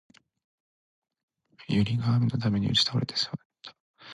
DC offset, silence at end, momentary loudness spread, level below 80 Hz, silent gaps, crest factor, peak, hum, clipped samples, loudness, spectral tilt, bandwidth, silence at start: under 0.1%; 0 s; 23 LU; -56 dBFS; 3.45-3.50 s, 3.80-3.94 s; 18 dB; -10 dBFS; none; under 0.1%; -26 LUFS; -5.5 dB/octave; 11 kHz; 1.6 s